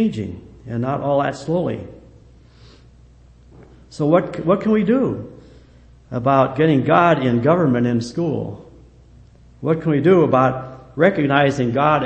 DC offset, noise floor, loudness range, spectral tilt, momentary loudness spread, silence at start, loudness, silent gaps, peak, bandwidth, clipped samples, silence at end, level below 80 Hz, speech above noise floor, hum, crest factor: under 0.1%; -47 dBFS; 7 LU; -8 dB/octave; 16 LU; 0 s; -18 LUFS; none; 0 dBFS; 8.6 kHz; under 0.1%; 0 s; -48 dBFS; 30 dB; none; 18 dB